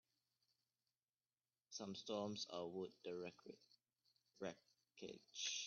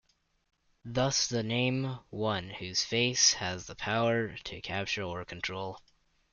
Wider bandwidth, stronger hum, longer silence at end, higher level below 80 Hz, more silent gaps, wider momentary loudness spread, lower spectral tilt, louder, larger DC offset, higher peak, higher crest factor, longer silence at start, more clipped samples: second, 7 kHz vs 11 kHz; neither; second, 0 s vs 0.55 s; second, under -90 dBFS vs -60 dBFS; neither; about the same, 15 LU vs 13 LU; about the same, -3 dB/octave vs -3 dB/octave; second, -51 LUFS vs -31 LUFS; neither; second, -34 dBFS vs -12 dBFS; about the same, 20 dB vs 22 dB; first, 1.7 s vs 0.85 s; neither